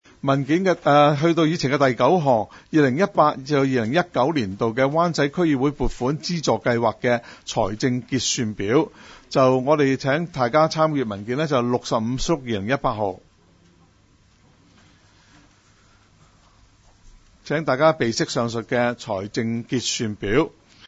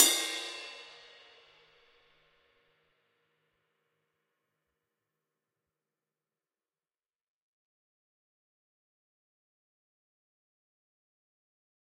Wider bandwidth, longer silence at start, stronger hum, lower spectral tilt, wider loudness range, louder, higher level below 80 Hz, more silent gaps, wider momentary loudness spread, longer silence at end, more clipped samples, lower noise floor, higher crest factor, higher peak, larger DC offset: second, 8 kHz vs 13.5 kHz; first, 0.25 s vs 0 s; neither; first, -5.5 dB/octave vs 2.5 dB/octave; second, 8 LU vs 25 LU; first, -21 LUFS vs -31 LUFS; first, -44 dBFS vs -88 dBFS; neither; second, 7 LU vs 27 LU; second, 0.4 s vs 11 s; neither; second, -57 dBFS vs under -90 dBFS; second, 20 dB vs 38 dB; about the same, -2 dBFS vs -4 dBFS; neither